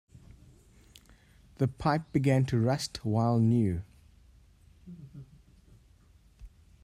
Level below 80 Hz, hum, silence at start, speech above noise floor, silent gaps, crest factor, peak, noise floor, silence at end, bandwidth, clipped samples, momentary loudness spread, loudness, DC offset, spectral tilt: -56 dBFS; none; 1.6 s; 33 dB; none; 18 dB; -14 dBFS; -60 dBFS; 0.35 s; 13 kHz; under 0.1%; 24 LU; -29 LUFS; under 0.1%; -7 dB/octave